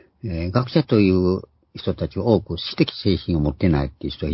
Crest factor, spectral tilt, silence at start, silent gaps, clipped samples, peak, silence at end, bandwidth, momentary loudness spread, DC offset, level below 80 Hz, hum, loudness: 18 dB; -11 dB/octave; 0.25 s; none; under 0.1%; -4 dBFS; 0 s; 5.8 kHz; 11 LU; under 0.1%; -34 dBFS; none; -21 LUFS